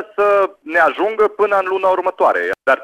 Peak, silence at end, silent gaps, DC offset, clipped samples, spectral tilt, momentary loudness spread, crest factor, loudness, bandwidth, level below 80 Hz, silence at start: -2 dBFS; 0 s; none; under 0.1%; under 0.1%; -4.5 dB/octave; 2 LU; 14 dB; -16 LUFS; 13.5 kHz; -58 dBFS; 0 s